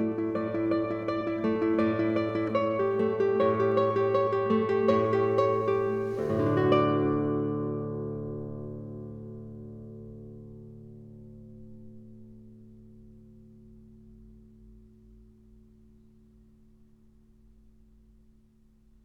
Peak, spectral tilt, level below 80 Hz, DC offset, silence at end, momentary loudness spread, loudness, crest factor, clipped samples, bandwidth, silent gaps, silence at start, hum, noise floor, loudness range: -10 dBFS; -9 dB/octave; -60 dBFS; under 0.1%; 4.3 s; 23 LU; -27 LUFS; 20 dB; under 0.1%; 6.6 kHz; none; 0 s; none; -60 dBFS; 22 LU